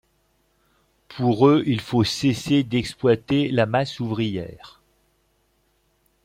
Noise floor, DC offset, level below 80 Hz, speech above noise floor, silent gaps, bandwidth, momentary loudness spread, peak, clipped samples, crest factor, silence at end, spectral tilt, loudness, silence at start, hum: -66 dBFS; under 0.1%; -56 dBFS; 45 dB; none; 15.5 kHz; 10 LU; -4 dBFS; under 0.1%; 18 dB; 1.55 s; -6.5 dB/octave; -21 LUFS; 1.1 s; none